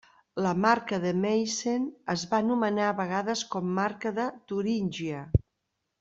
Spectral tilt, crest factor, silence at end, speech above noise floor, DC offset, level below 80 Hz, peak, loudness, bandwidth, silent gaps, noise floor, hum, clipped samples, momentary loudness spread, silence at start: -5.5 dB/octave; 20 dB; 0.65 s; 54 dB; under 0.1%; -50 dBFS; -8 dBFS; -29 LUFS; 7.8 kHz; none; -81 dBFS; none; under 0.1%; 7 LU; 0.35 s